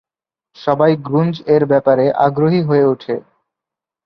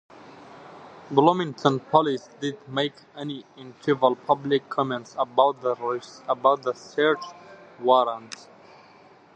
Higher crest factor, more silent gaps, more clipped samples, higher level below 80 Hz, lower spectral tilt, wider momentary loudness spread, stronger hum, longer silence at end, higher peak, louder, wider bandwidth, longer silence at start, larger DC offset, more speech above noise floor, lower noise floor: second, 14 dB vs 24 dB; neither; neither; first, -58 dBFS vs -74 dBFS; first, -10 dB/octave vs -6 dB/octave; second, 10 LU vs 18 LU; neither; second, 0.85 s vs 1 s; about the same, -2 dBFS vs -2 dBFS; first, -15 LUFS vs -24 LUFS; second, 6 kHz vs 9 kHz; about the same, 0.6 s vs 0.55 s; neither; first, 74 dB vs 28 dB; first, -88 dBFS vs -52 dBFS